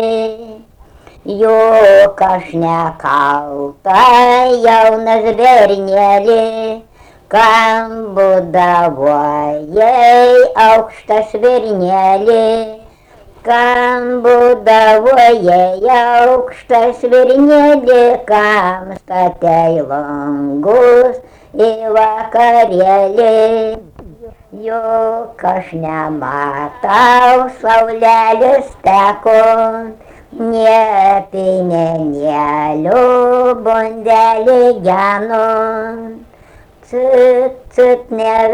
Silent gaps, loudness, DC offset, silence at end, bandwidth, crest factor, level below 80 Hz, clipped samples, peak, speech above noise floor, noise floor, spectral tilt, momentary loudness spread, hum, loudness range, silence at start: none; -10 LUFS; under 0.1%; 0 s; 13 kHz; 10 dB; -46 dBFS; under 0.1%; 0 dBFS; 32 dB; -41 dBFS; -5.5 dB/octave; 11 LU; none; 4 LU; 0 s